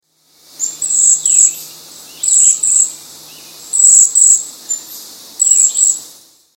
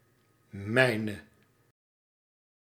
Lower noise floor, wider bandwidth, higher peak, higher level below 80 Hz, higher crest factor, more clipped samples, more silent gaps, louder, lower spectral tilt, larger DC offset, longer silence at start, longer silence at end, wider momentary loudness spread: second, -50 dBFS vs -67 dBFS; about the same, 17 kHz vs 15.5 kHz; first, 0 dBFS vs -8 dBFS; first, -60 dBFS vs -74 dBFS; second, 14 dB vs 26 dB; neither; neither; first, -8 LUFS vs -28 LUFS; second, 2.5 dB/octave vs -5.5 dB/octave; neither; about the same, 0.6 s vs 0.55 s; second, 0.5 s vs 1.45 s; second, 16 LU vs 20 LU